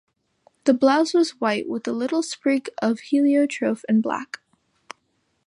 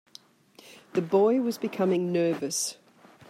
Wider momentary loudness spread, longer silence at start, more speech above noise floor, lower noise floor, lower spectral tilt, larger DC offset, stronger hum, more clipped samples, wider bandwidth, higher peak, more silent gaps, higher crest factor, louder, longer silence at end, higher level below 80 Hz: about the same, 9 LU vs 9 LU; about the same, 0.65 s vs 0.65 s; first, 49 dB vs 31 dB; first, -70 dBFS vs -56 dBFS; about the same, -4.5 dB/octave vs -5 dB/octave; neither; neither; neither; second, 11 kHz vs 16 kHz; first, -4 dBFS vs -12 dBFS; neither; about the same, 18 dB vs 16 dB; first, -22 LUFS vs -27 LUFS; first, 1.2 s vs 0.55 s; first, -74 dBFS vs -80 dBFS